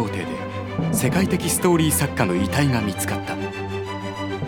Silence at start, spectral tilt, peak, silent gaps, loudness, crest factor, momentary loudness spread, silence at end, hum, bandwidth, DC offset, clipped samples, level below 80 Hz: 0 s; -5 dB/octave; -2 dBFS; none; -22 LUFS; 20 dB; 10 LU; 0 s; none; over 20 kHz; under 0.1%; under 0.1%; -44 dBFS